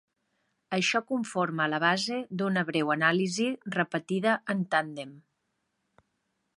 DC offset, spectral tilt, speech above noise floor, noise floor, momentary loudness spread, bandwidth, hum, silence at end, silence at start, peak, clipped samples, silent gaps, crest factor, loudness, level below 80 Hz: under 0.1%; -4.5 dB/octave; 50 dB; -79 dBFS; 7 LU; 11.5 kHz; none; 1.4 s; 0.7 s; -10 dBFS; under 0.1%; none; 20 dB; -28 LUFS; -78 dBFS